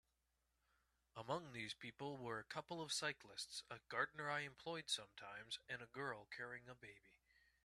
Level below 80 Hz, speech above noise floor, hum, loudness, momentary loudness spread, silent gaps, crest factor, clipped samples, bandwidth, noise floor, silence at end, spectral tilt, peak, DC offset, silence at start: -82 dBFS; 37 dB; none; -48 LUFS; 12 LU; none; 24 dB; under 0.1%; 13.5 kHz; -87 dBFS; 0.5 s; -2.5 dB/octave; -28 dBFS; under 0.1%; 1.15 s